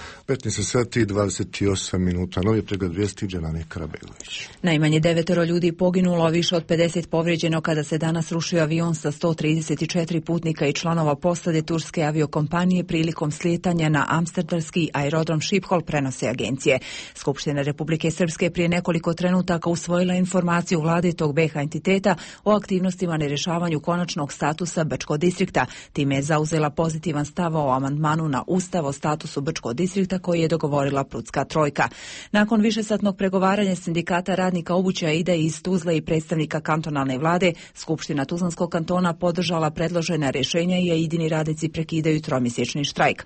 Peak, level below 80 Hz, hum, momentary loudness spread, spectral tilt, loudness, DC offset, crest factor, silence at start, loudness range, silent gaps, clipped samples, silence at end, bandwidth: -6 dBFS; -50 dBFS; none; 5 LU; -5.5 dB/octave; -23 LUFS; under 0.1%; 16 dB; 0 s; 2 LU; none; under 0.1%; 0 s; 8.8 kHz